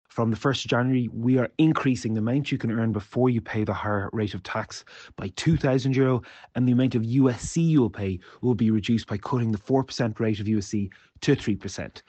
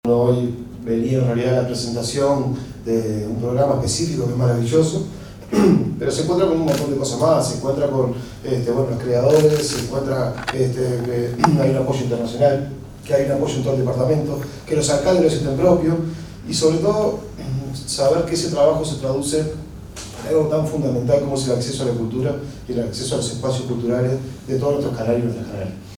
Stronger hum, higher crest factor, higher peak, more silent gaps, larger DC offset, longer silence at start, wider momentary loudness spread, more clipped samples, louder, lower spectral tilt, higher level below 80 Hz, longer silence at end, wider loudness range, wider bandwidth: neither; about the same, 16 dB vs 18 dB; second, -8 dBFS vs 0 dBFS; neither; neither; about the same, 0.15 s vs 0.05 s; about the same, 9 LU vs 10 LU; neither; second, -25 LUFS vs -20 LUFS; about the same, -6.5 dB/octave vs -6 dB/octave; second, -52 dBFS vs -42 dBFS; about the same, 0.1 s vs 0 s; about the same, 3 LU vs 3 LU; second, 8.8 kHz vs 17.5 kHz